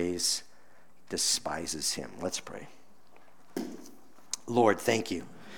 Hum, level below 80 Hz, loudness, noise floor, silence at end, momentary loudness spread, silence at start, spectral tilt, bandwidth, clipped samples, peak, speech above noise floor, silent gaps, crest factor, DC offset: none; -66 dBFS; -31 LUFS; -62 dBFS; 0 s; 16 LU; 0 s; -2.5 dB/octave; over 20 kHz; under 0.1%; -10 dBFS; 32 dB; none; 24 dB; 0.4%